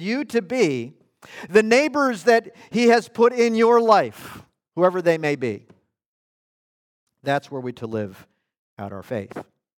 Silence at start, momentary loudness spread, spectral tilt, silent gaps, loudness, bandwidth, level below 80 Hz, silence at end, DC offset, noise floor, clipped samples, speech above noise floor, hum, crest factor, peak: 0 s; 20 LU; -5 dB/octave; 6.06-7.07 s, 8.58-8.77 s; -20 LUFS; 16 kHz; -70 dBFS; 0.35 s; under 0.1%; under -90 dBFS; under 0.1%; over 70 dB; none; 18 dB; -4 dBFS